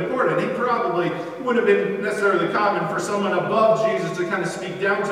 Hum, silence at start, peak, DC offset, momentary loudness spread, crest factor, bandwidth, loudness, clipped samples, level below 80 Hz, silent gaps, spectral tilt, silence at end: none; 0 s; -6 dBFS; under 0.1%; 6 LU; 16 dB; 14 kHz; -21 LUFS; under 0.1%; -68 dBFS; none; -5.5 dB/octave; 0 s